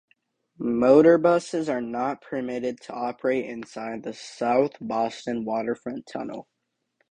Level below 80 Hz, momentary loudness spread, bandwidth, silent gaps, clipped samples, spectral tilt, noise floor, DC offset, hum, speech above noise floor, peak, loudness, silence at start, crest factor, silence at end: -66 dBFS; 17 LU; 9.8 kHz; none; under 0.1%; -6 dB/octave; -73 dBFS; under 0.1%; none; 49 dB; -4 dBFS; -25 LUFS; 0.6 s; 20 dB; 0.7 s